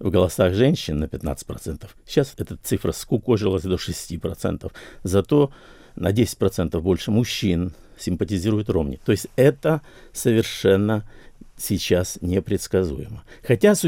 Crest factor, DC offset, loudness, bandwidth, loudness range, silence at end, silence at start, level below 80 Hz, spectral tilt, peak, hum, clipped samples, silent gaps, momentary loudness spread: 20 dB; under 0.1%; -22 LUFS; 17 kHz; 3 LU; 0 s; 0 s; -44 dBFS; -6 dB/octave; -2 dBFS; none; under 0.1%; none; 13 LU